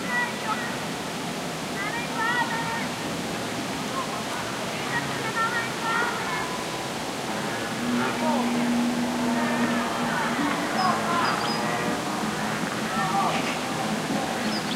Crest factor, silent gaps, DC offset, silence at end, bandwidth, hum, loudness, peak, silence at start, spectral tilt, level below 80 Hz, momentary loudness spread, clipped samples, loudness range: 16 dB; none; under 0.1%; 0 s; 16 kHz; none; -26 LUFS; -10 dBFS; 0 s; -3.5 dB/octave; -56 dBFS; 5 LU; under 0.1%; 3 LU